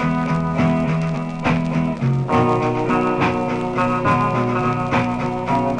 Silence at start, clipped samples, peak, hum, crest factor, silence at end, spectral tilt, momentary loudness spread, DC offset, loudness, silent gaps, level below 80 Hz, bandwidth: 0 s; under 0.1%; -4 dBFS; none; 14 dB; 0 s; -7.5 dB/octave; 4 LU; under 0.1%; -19 LUFS; none; -42 dBFS; 10 kHz